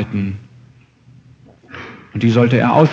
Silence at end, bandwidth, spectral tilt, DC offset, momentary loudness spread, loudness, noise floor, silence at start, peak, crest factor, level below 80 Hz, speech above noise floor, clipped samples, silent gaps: 0 s; 7.4 kHz; -8 dB/octave; under 0.1%; 21 LU; -15 LUFS; -47 dBFS; 0 s; 0 dBFS; 18 dB; -54 dBFS; 34 dB; under 0.1%; none